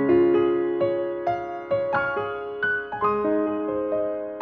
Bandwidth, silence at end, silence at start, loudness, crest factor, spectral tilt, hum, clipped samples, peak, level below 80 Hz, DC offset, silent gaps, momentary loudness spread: 4.6 kHz; 0 s; 0 s; -24 LUFS; 14 dB; -8.5 dB/octave; none; under 0.1%; -10 dBFS; -58 dBFS; under 0.1%; none; 8 LU